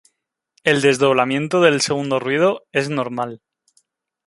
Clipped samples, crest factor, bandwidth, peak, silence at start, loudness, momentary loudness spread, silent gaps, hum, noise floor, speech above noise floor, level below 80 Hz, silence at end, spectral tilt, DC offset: under 0.1%; 18 dB; 11.5 kHz; -2 dBFS; 0.65 s; -18 LUFS; 8 LU; none; none; -73 dBFS; 55 dB; -62 dBFS; 0.9 s; -4.5 dB/octave; under 0.1%